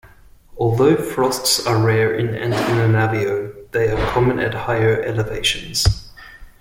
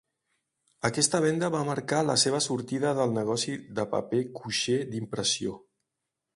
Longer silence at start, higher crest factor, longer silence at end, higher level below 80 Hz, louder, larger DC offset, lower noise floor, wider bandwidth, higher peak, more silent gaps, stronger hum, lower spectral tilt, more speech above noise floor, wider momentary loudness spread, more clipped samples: second, 0.05 s vs 0.85 s; about the same, 16 dB vs 20 dB; second, 0.15 s vs 0.75 s; first, -34 dBFS vs -66 dBFS; first, -18 LUFS vs -28 LUFS; neither; second, -46 dBFS vs -85 dBFS; first, 16.5 kHz vs 11.5 kHz; first, -2 dBFS vs -8 dBFS; neither; neither; first, -5 dB/octave vs -3.5 dB/octave; second, 28 dB vs 57 dB; about the same, 6 LU vs 8 LU; neither